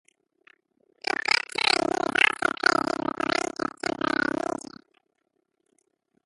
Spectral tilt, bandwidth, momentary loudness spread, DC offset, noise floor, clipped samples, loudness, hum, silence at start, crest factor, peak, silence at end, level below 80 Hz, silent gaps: -2.5 dB/octave; 11.5 kHz; 10 LU; under 0.1%; -76 dBFS; under 0.1%; -25 LUFS; none; 1.1 s; 24 dB; -4 dBFS; 2 s; -64 dBFS; none